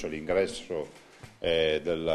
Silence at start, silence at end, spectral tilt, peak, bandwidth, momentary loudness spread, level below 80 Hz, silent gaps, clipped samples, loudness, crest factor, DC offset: 0 s; 0 s; -4.5 dB/octave; -14 dBFS; 12 kHz; 10 LU; -54 dBFS; none; under 0.1%; -29 LUFS; 16 dB; under 0.1%